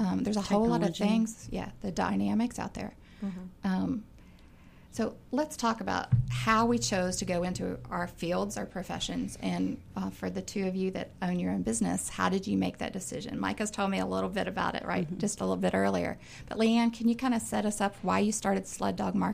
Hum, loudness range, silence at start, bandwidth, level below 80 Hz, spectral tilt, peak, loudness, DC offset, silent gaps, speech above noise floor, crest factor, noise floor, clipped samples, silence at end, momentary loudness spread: none; 5 LU; 0 s; 15.5 kHz; -52 dBFS; -5 dB/octave; -12 dBFS; -31 LUFS; under 0.1%; none; 23 dB; 18 dB; -54 dBFS; under 0.1%; 0 s; 10 LU